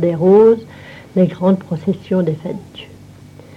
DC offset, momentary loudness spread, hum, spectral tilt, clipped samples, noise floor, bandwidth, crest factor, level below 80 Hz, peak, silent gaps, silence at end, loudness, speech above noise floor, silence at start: under 0.1%; 25 LU; none; -9.5 dB/octave; under 0.1%; -39 dBFS; 7.2 kHz; 14 dB; -54 dBFS; -2 dBFS; none; 0.7 s; -15 LUFS; 25 dB; 0 s